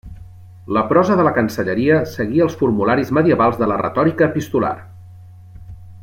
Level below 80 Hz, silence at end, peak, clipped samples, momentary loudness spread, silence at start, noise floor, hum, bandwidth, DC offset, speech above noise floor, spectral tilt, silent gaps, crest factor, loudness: -48 dBFS; 0 s; -2 dBFS; under 0.1%; 6 LU; 0.05 s; -39 dBFS; none; 16.5 kHz; under 0.1%; 23 dB; -7.5 dB/octave; none; 16 dB; -17 LUFS